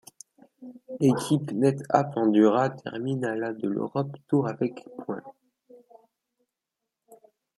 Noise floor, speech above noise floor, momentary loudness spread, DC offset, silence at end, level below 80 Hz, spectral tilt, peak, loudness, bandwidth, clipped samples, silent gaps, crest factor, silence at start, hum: -86 dBFS; 61 dB; 16 LU; under 0.1%; 0.4 s; -72 dBFS; -7 dB/octave; -4 dBFS; -26 LUFS; 13 kHz; under 0.1%; none; 24 dB; 0.6 s; none